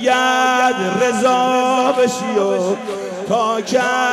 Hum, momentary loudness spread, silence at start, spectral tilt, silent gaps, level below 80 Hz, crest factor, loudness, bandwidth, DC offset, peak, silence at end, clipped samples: none; 6 LU; 0 s; -3.5 dB/octave; none; -64 dBFS; 12 dB; -16 LUFS; 14.5 kHz; under 0.1%; -4 dBFS; 0 s; under 0.1%